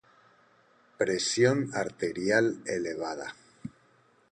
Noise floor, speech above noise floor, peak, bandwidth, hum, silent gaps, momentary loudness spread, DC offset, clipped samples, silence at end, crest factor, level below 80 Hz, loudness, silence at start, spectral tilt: -64 dBFS; 36 dB; -10 dBFS; 10 kHz; none; none; 21 LU; under 0.1%; under 0.1%; 0.65 s; 22 dB; -68 dBFS; -29 LUFS; 1 s; -4 dB/octave